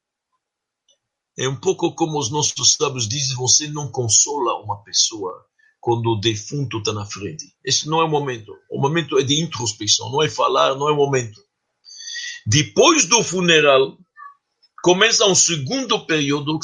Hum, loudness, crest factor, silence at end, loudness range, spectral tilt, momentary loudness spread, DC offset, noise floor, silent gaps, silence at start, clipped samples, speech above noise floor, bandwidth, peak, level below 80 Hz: none; -18 LUFS; 20 dB; 0 s; 6 LU; -2.5 dB/octave; 15 LU; under 0.1%; -82 dBFS; none; 1.4 s; under 0.1%; 63 dB; 11 kHz; 0 dBFS; -60 dBFS